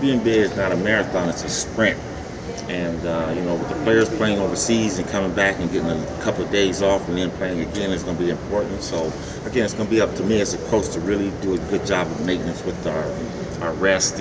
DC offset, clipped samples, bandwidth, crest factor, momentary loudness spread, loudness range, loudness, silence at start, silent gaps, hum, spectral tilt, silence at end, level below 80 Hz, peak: under 0.1%; under 0.1%; 8 kHz; 18 dB; 8 LU; 3 LU; -22 LUFS; 0 s; none; none; -4.5 dB/octave; 0 s; -40 dBFS; -4 dBFS